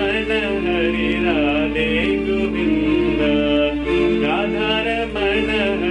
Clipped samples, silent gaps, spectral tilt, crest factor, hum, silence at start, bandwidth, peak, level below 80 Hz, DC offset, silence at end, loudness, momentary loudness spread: under 0.1%; none; -6.5 dB/octave; 12 dB; none; 0 s; 10 kHz; -6 dBFS; -34 dBFS; under 0.1%; 0 s; -18 LUFS; 2 LU